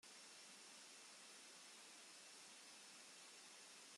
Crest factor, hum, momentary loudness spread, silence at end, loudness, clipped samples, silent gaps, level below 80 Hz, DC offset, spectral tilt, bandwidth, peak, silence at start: 12 dB; none; 0 LU; 0 s; -60 LUFS; under 0.1%; none; under -90 dBFS; under 0.1%; 0.5 dB/octave; 13 kHz; -50 dBFS; 0.05 s